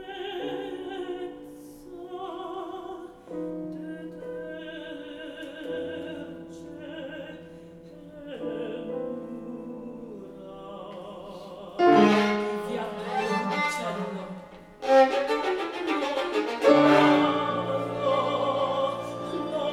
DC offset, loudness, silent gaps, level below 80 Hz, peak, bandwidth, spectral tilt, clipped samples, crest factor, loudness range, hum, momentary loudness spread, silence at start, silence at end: under 0.1%; -26 LUFS; none; -62 dBFS; -6 dBFS; 14 kHz; -5.5 dB/octave; under 0.1%; 22 dB; 15 LU; none; 22 LU; 0 s; 0 s